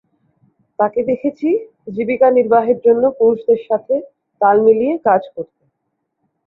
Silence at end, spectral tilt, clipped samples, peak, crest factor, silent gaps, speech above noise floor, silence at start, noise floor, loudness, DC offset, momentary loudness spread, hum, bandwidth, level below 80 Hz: 1.05 s; -9.5 dB/octave; under 0.1%; -2 dBFS; 14 dB; none; 58 dB; 0.8 s; -73 dBFS; -15 LUFS; under 0.1%; 12 LU; none; 4.1 kHz; -60 dBFS